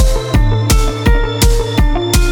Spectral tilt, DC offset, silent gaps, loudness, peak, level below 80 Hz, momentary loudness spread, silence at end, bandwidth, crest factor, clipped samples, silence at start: -5 dB/octave; under 0.1%; none; -14 LUFS; 0 dBFS; -12 dBFS; 2 LU; 0 s; 19 kHz; 10 dB; under 0.1%; 0 s